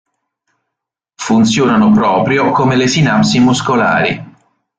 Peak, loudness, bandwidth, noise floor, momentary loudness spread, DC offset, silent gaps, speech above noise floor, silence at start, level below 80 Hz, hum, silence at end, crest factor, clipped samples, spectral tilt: -2 dBFS; -11 LUFS; 9.2 kHz; -79 dBFS; 5 LU; under 0.1%; none; 68 dB; 1.2 s; -46 dBFS; none; 0.5 s; 12 dB; under 0.1%; -5 dB/octave